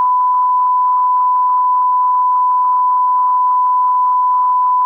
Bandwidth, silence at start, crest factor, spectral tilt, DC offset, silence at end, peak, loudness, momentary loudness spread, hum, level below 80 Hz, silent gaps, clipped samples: 1.9 kHz; 0 s; 4 dB; -1.5 dB/octave; under 0.1%; 0 s; -8 dBFS; -13 LUFS; 0 LU; none; -82 dBFS; none; under 0.1%